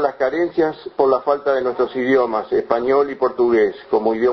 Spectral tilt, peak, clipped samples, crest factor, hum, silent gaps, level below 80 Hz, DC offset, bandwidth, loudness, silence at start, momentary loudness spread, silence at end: -7.5 dB/octave; -2 dBFS; under 0.1%; 16 dB; none; none; -56 dBFS; under 0.1%; 6.2 kHz; -18 LUFS; 0 s; 4 LU; 0 s